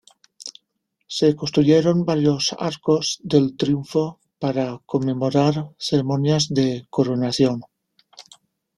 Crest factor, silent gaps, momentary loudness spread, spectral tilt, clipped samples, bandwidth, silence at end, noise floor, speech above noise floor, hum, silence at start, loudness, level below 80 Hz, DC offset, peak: 18 dB; none; 10 LU; -6 dB/octave; under 0.1%; 12 kHz; 0.55 s; -74 dBFS; 55 dB; none; 0.4 s; -21 LUFS; -58 dBFS; under 0.1%; -4 dBFS